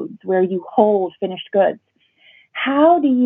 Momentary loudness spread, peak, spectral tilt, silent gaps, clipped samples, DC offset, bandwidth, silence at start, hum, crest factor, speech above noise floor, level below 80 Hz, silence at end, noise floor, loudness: 12 LU; -2 dBFS; -4.5 dB/octave; none; under 0.1%; under 0.1%; 3.9 kHz; 0 s; none; 16 dB; 37 dB; -70 dBFS; 0 s; -53 dBFS; -17 LUFS